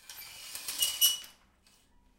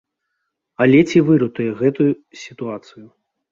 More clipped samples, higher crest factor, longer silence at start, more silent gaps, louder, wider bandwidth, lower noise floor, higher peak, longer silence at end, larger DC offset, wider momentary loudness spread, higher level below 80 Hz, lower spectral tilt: neither; first, 24 dB vs 16 dB; second, 0.05 s vs 0.8 s; neither; second, -28 LUFS vs -16 LUFS; first, 17 kHz vs 7.6 kHz; second, -65 dBFS vs -76 dBFS; second, -10 dBFS vs -2 dBFS; first, 0.85 s vs 0.45 s; neither; first, 20 LU vs 17 LU; second, -68 dBFS vs -60 dBFS; second, 3 dB/octave vs -7.5 dB/octave